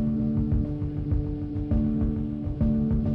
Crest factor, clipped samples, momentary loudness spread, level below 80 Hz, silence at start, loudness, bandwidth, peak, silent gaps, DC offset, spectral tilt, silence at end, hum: 10 dB; under 0.1%; 6 LU; -32 dBFS; 0 s; -27 LUFS; 4.3 kHz; -16 dBFS; none; under 0.1%; -12 dB/octave; 0 s; none